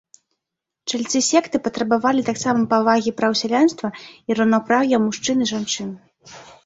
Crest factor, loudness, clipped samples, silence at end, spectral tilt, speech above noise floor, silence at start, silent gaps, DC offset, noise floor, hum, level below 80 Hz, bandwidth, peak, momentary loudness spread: 18 dB; -19 LUFS; under 0.1%; 0.2 s; -3.5 dB/octave; 64 dB; 0.85 s; none; under 0.1%; -83 dBFS; none; -62 dBFS; 8 kHz; -2 dBFS; 10 LU